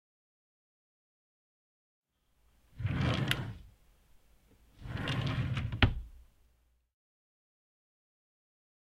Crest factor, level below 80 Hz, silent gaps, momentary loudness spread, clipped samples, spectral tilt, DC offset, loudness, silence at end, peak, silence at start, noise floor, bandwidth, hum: 32 dB; -48 dBFS; none; 18 LU; under 0.1%; -6 dB/octave; under 0.1%; -34 LUFS; 2.75 s; -6 dBFS; 2.75 s; -72 dBFS; 15 kHz; none